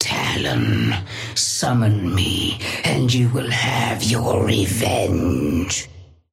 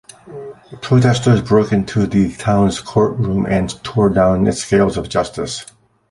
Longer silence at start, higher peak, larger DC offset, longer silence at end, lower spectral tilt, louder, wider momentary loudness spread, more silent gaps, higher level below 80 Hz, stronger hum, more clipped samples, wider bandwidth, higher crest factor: second, 0 s vs 0.25 s; about the same, -4 dBFS vs -2 dBFS; neither; second, 0.3 s vs 0.45 s; second, -4.5 dB/octave vs -6.5 dB/octave; second, -19 LUFS vs -16 LUFS; second, 4 LU vs 16 LU; neither; about the same, -42 dBFS vs -38 dBFS; neither; neither; first, 16 kHz vs 11.5 kHz; about the same, 16 dB vs 14 dB